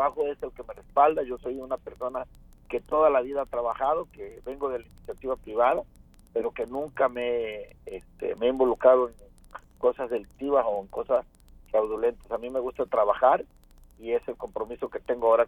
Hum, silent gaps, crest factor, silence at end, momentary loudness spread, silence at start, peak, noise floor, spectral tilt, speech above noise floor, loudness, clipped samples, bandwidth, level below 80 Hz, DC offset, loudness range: none; none; 20 dB; 0 s; 18 LU; 0 s; -6 dBFS; -48 dBFS; -6.5 dB/octave; 22 dB; -27 LUFS; under 0.1%; 12 kHz; -54 dBFS; under 0.1%; 3 LU